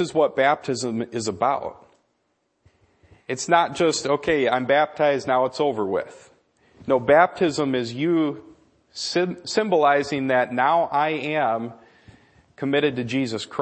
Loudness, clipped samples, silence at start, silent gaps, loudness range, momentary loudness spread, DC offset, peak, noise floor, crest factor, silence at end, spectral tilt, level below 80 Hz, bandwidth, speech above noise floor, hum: -22 LUFS; under 0.1%; 0 s; none; 4 LU; 10 LU; under 0.1%; -2 dBFS; -71 dBFS; 22 dB; 0 s; -4.5 dB/octave; -62 dBFS; 8.8 kHz; 49 dB; none